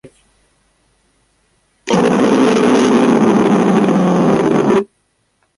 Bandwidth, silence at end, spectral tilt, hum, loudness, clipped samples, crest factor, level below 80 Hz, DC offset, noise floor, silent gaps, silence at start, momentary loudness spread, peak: 11.5 kHz; 0.75 s; -6.5 dB/octave; none; -12 LUFS; under 0.1%; 14 dB; -52 dBFS; under 0.1%; -63 dBFS; none; 0.05 s; 5 LU; 0 dBFS